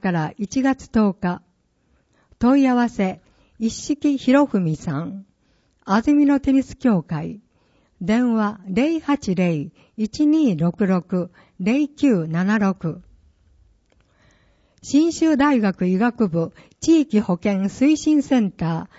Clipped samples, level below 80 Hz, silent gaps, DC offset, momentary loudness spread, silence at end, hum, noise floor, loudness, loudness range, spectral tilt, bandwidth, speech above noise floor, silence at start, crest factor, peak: under 0.1%; -50 dBFS; none; under 0.1%; 12 LU; 0.15 s; none; -63 dBFS; -20 LUFS; 4 LU; -6.5 dB/octave; 8 kHz; 44 dB; 0 s; 16 dB; -6 dBFS